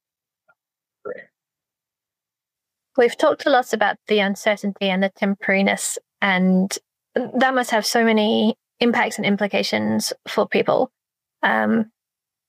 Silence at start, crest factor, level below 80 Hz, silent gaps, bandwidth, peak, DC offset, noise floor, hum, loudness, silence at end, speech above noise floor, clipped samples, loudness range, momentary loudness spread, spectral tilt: 1.05 s; 20 dB; -76 dBFS; none; 15.5 kHz; -2 dBFS; under 0.1%; -88 dBFS; none; -20 LUFS; 0.65 s; 69 dB; under 0.1%; 3 LU; 9 LU; -4.5 dB/octave